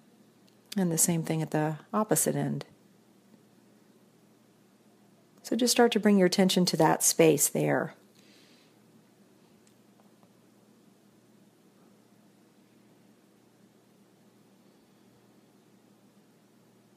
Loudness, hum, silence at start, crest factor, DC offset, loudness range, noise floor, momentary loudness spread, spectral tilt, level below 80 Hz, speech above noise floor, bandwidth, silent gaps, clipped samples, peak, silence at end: -26 LUFS; none; 0.75 s; 24 dB; under 0.1%; 13 LU; -62 dBFS; 12 LU; -4 dB/octave; -78 dBFS; 36 dB; 15.5 kHz; none; under 0.1%; -8 dBFS; 9.05 s